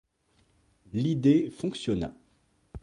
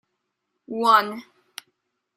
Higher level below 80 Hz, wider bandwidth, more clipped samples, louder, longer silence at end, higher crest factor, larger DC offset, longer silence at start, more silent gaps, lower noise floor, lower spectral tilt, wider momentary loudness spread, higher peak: first, -54 dBFS vs -80 dBFS; second, 11 kHz vs 16 kHz; neither; second, -28 LUFS vs -20 LUFS; second, 0.05 s vs 0.95 s; about the same, 18 dB vs 22 dB; neither; first, 0.95 s vs 0.7 s; neither; second, -68 dBFS vs -78 dBFS; first, -7.5 dB/octave vs -3 dB/octave; second, 14 LU vs 24 LU; second, -12 dBFS vs -4 dBFS